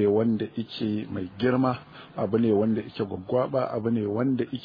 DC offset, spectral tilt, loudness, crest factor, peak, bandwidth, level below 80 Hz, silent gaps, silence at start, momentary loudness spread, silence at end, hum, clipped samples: under 0.1%; -10 dB/octave; -27 LUFS; 16 dB; -10 dBFS; 5.2 kHz; -62 dBFS; none; 0 s; 9 LU; 0 s; none; under 0.1%